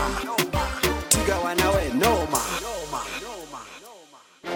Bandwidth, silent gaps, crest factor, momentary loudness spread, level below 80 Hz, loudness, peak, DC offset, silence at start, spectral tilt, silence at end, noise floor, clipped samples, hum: 17.5 kHz; none; 20 dB; 18 LU; -36 dBFS; -24 LUFS; -6 dBFS; under 0.1%; 0 s; -3 dB/octave; 0 s; -50 dBFS; under 0.1%; none